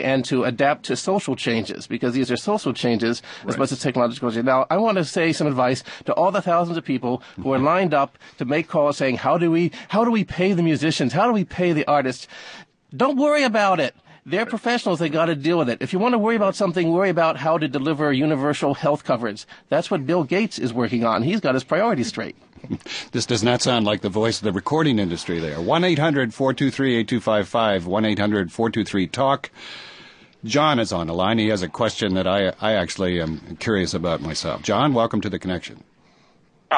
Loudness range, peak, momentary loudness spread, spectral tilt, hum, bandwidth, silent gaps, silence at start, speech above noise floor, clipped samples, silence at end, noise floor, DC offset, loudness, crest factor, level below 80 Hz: 2 LU; -4 dBFS; 8 LU; -5.5 dB/octave; none; 10.5 kHz; none; 0 s; 36 dB; under 0.1%; 0 s; -57 dBFS; under 0.1%; -21 LUFS; 16 dB; -50 dBFS